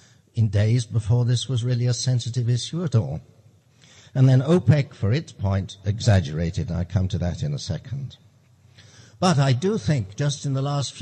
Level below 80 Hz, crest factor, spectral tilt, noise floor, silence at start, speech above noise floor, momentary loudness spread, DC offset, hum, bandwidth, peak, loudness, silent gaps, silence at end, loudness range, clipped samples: -48 dBFS; 18 dB; -6.5 dB/octave; -55 dBFS; 0.35 s; 33 dB; 11 LU; under 0.1%; none; 9 kHz; -4 dBFS; -23 LUFS; none; 0 s; 4 LU; under 0.1%